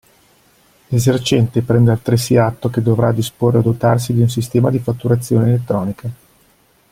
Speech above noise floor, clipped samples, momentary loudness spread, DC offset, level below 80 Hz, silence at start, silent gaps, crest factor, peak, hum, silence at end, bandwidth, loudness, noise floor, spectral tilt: 40 dB; under 0.1%; 6 LU; under 0.1%; -46 dBFS; 0.9 s; none; 14 dB; -2 dBFS; none; 0.75 s; 16 kHz; -16 LUFS; -54 dBFS; -7 dB/octave